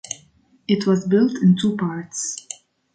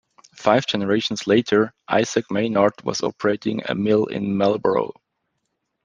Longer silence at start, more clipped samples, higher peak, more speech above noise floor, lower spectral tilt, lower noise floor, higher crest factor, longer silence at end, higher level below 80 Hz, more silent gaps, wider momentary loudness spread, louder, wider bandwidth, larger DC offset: second, 0.1 s vs 0.4 s; neither; second, -6 dBFS vs -2 dBFS; second, 37 dB vs 55 dB; about the same, -5.5 dB/octave vs -5 dB/octave; second, -56 dBFS vs -75 dBFS; about the same, 16 dB vs 20 dB; second, 0.4 s vs 0.95 s; about the same, -64 dBFS vs -62 dBFS; neither; first, 19 LU vs 6 LU; about the same, -20 LUFS vs -21 LUFS; about the same, 9.4 kHz vs 9.6 kHz; neither